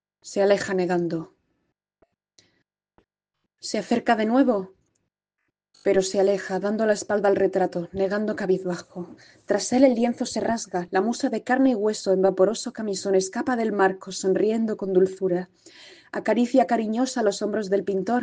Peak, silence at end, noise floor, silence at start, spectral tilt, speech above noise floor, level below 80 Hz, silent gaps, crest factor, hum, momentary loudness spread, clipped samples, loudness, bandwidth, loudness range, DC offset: -4 dBFS; 0 s; -81 dBFS; 0.25 s; -5 dB/octave; 58 dB; -64 dBFS; none; 20 dB; none; 9 LU; under 0.1%; -23 LUFS; 9.6 kHz; 4 LU; under 0.1%